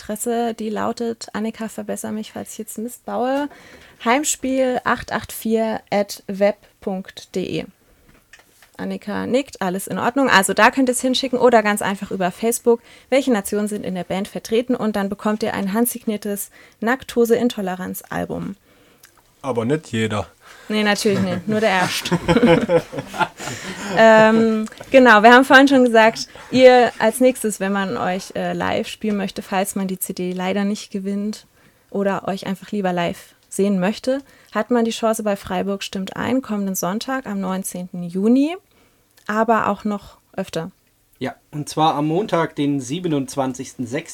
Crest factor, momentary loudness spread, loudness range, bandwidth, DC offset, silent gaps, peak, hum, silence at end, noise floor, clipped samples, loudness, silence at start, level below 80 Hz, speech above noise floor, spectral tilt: 18 dB; 15 LU; 11 LU; 18 kHz; under 0.1%; none; 0 dBFS; none; 0 s; -57 dBFS; under 0.1%; -19 LUFS; 0 s; -52 dBFS; 38 dB; -4.5 dB/octave